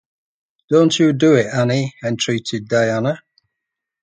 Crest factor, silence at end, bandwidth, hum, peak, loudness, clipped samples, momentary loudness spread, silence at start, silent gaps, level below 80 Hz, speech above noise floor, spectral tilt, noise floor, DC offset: 18 dB; 0.85 s; 9.4 kHz; none; 0 dBFS; -17 LUFS; under 0.1%; 9 LU; 0.7 s; none; -58 dBFS; 65 dB; -5.5 dB/octave; -81 dBFS; under 0.1%